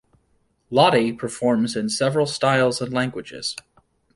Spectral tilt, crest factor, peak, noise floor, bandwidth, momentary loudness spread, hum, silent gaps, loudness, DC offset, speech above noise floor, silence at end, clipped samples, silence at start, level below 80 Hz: -4.5 dB/octave; 20 dB; -2 dBFS; -66 dBFS; 11.5 kHz; 12 LU; none; none; -21 LUFS; under 0.1%; 45 dB; 0.55 s; under 0.1%; 0.7 s; -60 dBFS